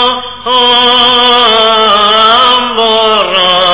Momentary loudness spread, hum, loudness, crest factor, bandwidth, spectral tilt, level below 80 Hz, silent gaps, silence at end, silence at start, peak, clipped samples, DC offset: 4 LU; none; -5 LUFS; 8 dB; 4 kHz; -6 dB/octave; -42 dBFS; none; 0 s; 0 s; 0 dBFS; 3%; 2%